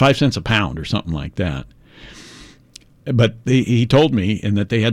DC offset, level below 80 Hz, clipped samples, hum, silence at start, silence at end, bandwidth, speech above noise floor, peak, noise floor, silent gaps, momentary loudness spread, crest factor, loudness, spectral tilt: under 0.1%; -40 dBFS; under 0.1%; none; 0 s; 0 s; 11.5 kHz; 30 dB; -4 dBFS; -46 dBFS; none; 17 LU; 14 dB; -18 LUFS; -6.5 dB/octave